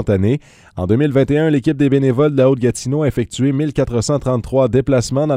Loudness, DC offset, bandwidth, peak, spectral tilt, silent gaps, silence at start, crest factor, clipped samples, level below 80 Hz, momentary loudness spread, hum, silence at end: -16 LUFS; under 0.1%; 13 kHz; -2 dBFS; -7 dB/octave; none; 0 s; 14 dB; under 0.1%; -38 dBFS; 5 LU; none; 0 s